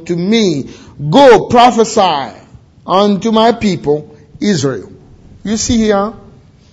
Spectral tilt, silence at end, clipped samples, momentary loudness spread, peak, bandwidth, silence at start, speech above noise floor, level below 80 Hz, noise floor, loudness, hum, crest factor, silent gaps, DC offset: -5 dB/octave; 0.55 s; 0.9%; 15 LU; 0 dBFS; 9 kHz; 0 s; 30 dB; -40 dBFS; -41 dBFS; -11 LUFS; none; 12 dB; none; under 0.1%